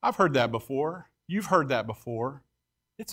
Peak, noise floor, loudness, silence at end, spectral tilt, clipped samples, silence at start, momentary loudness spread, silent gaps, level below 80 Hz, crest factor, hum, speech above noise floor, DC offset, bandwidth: -8 dBFS; -82 dBFS; -28 LUFS; 0 s; -5.5 dB/octave; under 0.1%; 0.05 s; 11 LU; none; -64 dBFS; 20 dB; none; 54 dB; under 0.1%; 16 kHz